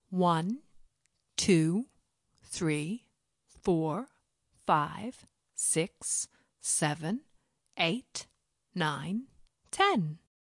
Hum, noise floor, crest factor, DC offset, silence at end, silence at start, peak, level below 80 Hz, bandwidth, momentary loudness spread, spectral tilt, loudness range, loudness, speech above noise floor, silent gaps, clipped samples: none; -78 dBFS; 22 dB; under 0.1%; 0.3 s; 0.1 s; -12 dBFS; -66 dBFS; 11.5 kHz; 15 LU; -4 dB/octave; 2 LU; -31 LUFS; 47 dB; none; under 0.1%